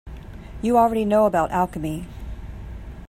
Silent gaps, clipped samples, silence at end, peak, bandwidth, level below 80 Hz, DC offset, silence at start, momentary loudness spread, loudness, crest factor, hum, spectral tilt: none; under 0.1%; 0 s; -6 dBFS; 15.5 kHz; -38 dBFS; under 0.1%; 0.05 s; 20 LU; -21 LUFS; 18 dB; none; -7 dB/octave